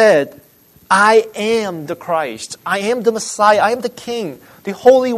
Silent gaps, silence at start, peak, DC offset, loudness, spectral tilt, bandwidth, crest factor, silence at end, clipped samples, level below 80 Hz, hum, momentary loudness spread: none; 0 s; 0 dBFS; under 0.1%; -15 LUFS; -3.5 dB/octave; 13.5 kHz; 16 dB; 0 s; under 0.1%; -60 dBFS; none; 15 LU